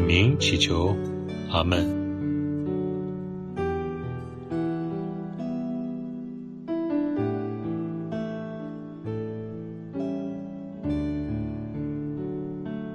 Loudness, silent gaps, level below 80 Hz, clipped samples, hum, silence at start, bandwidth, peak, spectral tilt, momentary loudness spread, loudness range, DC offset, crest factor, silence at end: -29 LUFS; none; -46 dBFS; under 0.1%; none; 0 s; 9.8 kHz; -6 dBFS; -6 dB/octave; 13 LU; 6 LU; under 0.1%; 22 dB; 0 s